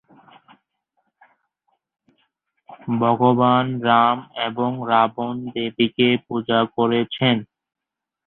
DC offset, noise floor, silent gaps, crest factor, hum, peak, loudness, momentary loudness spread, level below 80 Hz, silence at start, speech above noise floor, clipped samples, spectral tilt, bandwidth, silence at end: under 0.1%; -85 dBFS; none; 20 dB; none; -2 dBFS; -20 LUFS; 10 LU; -62 dBFS; 2.7 s; 66 dB; under 0.1%; -10.5 dB/octave; 4.2 kHz; 0.85 s